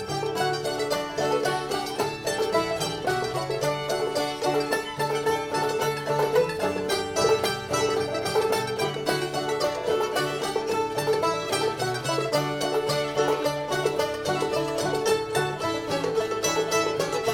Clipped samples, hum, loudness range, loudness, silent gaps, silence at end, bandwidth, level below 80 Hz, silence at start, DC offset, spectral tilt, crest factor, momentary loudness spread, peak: under 0.1%; none; 2 LU; -26 LUFS; none; 0 s; 18 kHz; -56 dBFS; 0 s; under 0.1%; -3.5 dB/octave; 16 dB; 3 LU; -10 dBFS